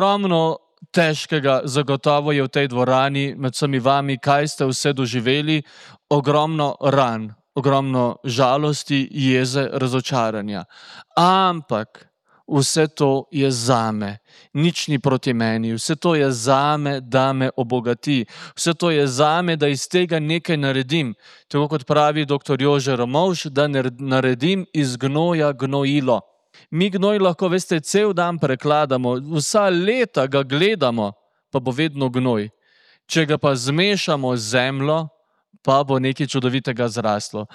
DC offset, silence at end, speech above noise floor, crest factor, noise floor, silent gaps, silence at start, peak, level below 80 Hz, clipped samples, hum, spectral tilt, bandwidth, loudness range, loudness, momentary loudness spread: under 0.1%; 0.1 s; 40 dB; 16 dB; -60 dBFS; none; 0 s; -2 dBFS; -66 dBFS; under 0.1%; none; -5 dB/octave; 14 kHz; 2 LU; -19 LUFS; 6 LU